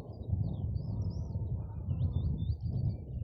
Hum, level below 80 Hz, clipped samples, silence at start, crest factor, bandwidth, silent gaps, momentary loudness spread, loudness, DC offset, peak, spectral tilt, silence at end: none; -42 dBFS; under 0.1%; 0 s; 14 dB; 6 kHz; none; 4 LU; -36 LUFS; under 0.1%; -20 dBFS; -11 dB/octave; 0 s